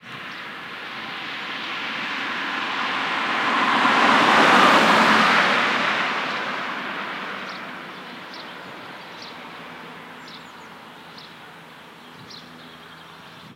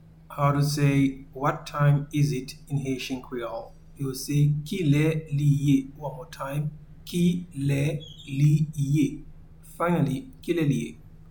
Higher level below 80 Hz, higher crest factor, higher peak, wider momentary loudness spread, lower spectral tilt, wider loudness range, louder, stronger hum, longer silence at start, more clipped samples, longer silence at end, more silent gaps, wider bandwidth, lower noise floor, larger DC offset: second, -70 dBFS vs -48 dBFS; first, 22 dB vs 16 dB; first, -2 dBFS vs -10 dBFS; first, 26 LU vs 13 LU; second, -3 dB/octave vs -7 dB/octave; first, 23 LU vs 2 LU; first, -19 LUFS vs -26 LUFS; neither; second, 0.05 s vs 0.3 s; neither; about the same, 0 s vs 0 s; neither; second, 16 kHz vs 19 kHz; about the same, -43 dBFS vs -46 dBFS; neither